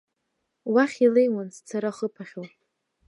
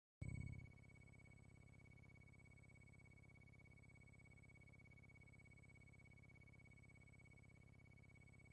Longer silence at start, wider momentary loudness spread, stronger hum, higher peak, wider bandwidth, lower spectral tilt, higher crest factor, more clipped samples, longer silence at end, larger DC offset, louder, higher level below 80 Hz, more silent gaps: first, 0.65 s vs 0.2 s; first, 19 LU vs 10 LU; second, none vs 50 Hz at -75 dBFS; first, -8 dBFS vs -40 dBFS; about the same, 11 kHz vs 10.5 kHz; about the same, -6 dB/octave vs -6.5 dB/octave; second, 18 dB vs 24 dB; neither; first, 0.6 s vs 0 s; neither; first, -24 LUFS vs -64 LUFS; second, -82 dBFS vs -70 dBFS; neither